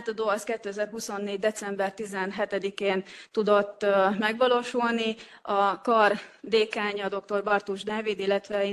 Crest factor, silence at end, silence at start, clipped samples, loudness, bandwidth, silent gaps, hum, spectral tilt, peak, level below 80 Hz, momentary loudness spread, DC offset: 20 dB; 0 s; 0 s; under 0.1%; -27 LUFS; 12.5 kHz; none; none; -4 dB/octave; -8 dBFS; -72 dBFS; 9 LU; under 0.1%